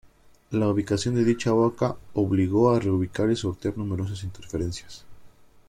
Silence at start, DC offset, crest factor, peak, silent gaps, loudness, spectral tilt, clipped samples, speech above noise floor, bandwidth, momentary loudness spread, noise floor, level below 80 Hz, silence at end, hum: 0.5 s; under 0.1%; 18 dB; -8 dBFS; none; -25 LUFS; -7 dB/octave; under 0.1%; 25 dB; 12.5 kHz; 12 LU; -49 dBFS; -52 dBFS; 0.4 s; none